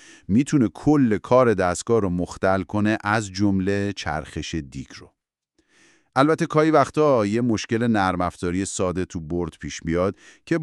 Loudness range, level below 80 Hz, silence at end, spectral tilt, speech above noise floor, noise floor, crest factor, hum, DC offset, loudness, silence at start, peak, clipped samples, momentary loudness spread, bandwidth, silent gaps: 5 LU; -48 dBFS; 0 s; -6 dB/octave; 48 dB; -70 dBFS; 18 dB; none; under 0.1%; -22 LUFS; 0.3 s; -4 dBFS; under 0.1%; 11 LU; 12 kHz; none